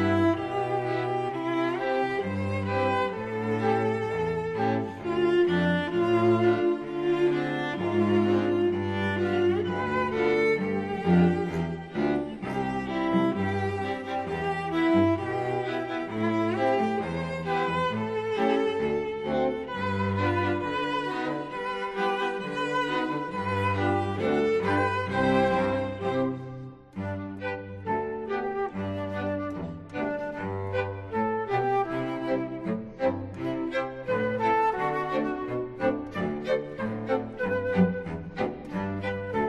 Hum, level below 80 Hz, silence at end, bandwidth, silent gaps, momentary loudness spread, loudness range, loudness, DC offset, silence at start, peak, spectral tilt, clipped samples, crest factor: none; -56 dBFS; 0 s; 10 kHz; none; 8 LU; 5 LU; -28 LUFS; under 0.1%; 0 s; -10 dBFS; -7.5 dB/octave; under 0.1%; 16 dB